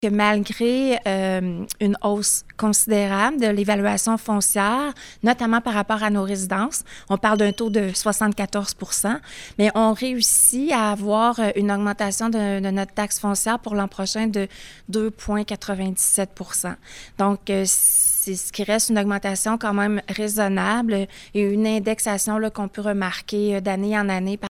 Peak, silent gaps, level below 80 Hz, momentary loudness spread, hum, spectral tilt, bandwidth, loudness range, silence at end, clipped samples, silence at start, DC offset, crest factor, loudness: -2 dBFS; none; -50 dBFS; 8 LU; none; -3.5 dB/octave; 17.5 kHz; 4 LU; 0 s; under 0.1%; 0 s; under 0.1%; 18 dB; -21 LUFS